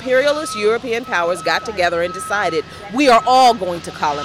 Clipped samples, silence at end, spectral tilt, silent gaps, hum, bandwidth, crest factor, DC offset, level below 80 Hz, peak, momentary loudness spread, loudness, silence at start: under 0.1%; 0 s; -3.5 dB/octave; none; none; 16 kHz; 12 dB; under 0.1%; -50 dBFS; -4 dBFS; 9 LU; -17 LUFS; 0 s